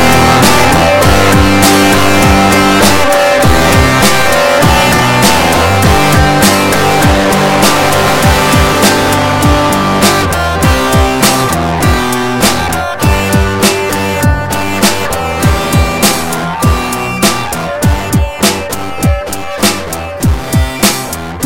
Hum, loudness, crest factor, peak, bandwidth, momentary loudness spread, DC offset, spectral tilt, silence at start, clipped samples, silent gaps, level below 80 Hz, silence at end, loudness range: none; -9 LUFS; 10 dB; 0 dBFS; over 20 kHz; 7 LU; 3%; -4 dB/octave; 0 s; 0.6%; none; -20 dBFS; 0 s; 6 LU